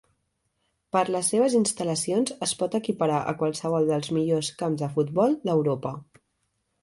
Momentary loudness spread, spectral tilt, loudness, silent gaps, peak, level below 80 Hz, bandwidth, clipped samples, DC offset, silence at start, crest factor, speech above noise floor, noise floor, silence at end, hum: 6 LU; -5 dB/octave; -25 LUFS; none; -8 dBFS; -66 dBFS; 12 kHz; under 0.1%; under 0.1%; 0.95 s; 18 dB; 50 dB; -75 dBFS; 0.8 s; none